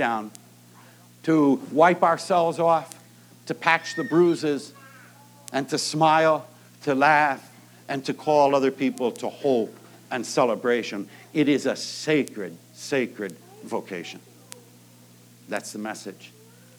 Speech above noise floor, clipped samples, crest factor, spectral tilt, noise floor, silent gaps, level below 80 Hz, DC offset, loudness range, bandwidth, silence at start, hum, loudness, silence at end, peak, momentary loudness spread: 28 dB; under 0.1%; 20 dB; -5 dB/octave; -51 dBFS; none; -86 dBFS; under 0.1%; 11 LU; over 20 kHz; 0 s; 60 Hz at -55 dBFS; -23 LUFS; 0.5 s; -4 dBFS; 17 LU